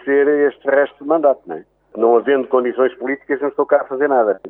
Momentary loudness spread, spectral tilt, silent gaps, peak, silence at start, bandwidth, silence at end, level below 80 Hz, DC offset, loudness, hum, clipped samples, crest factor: 9 LU; -9 dB/octave; none; -2 dBFS; 0.05 s; 3.6 kHz; 0 s; -68 dBFS; under 0.1%; -17 LUFS; none; under 0.1%; 16 dB